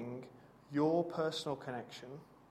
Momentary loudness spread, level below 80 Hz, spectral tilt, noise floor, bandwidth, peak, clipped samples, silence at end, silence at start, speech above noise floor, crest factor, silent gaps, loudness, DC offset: 19 LU; -76 dBFS; -6 dB/octave; -57 dBFS; 14 kHz; -22 dBFS; under 0.1%; 0.2 s; 0 s; 20 dB; 18 dB; none; -37 LUFS; under 0.1%